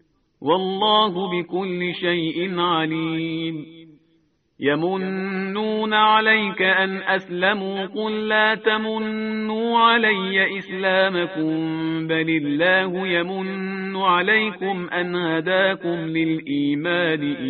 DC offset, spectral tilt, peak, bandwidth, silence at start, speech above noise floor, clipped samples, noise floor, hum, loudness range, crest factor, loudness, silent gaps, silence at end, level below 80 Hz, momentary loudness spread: under 0.1%; -2.5 dB/octave; -2 dBFS; 4.7 kHz; 0.4 s; 43 dB; under 0.1%; -64 dBFS; none; 5 LU; 18 dB; -21 LUFS; none; 0 s; -66 dBFS; 8 LU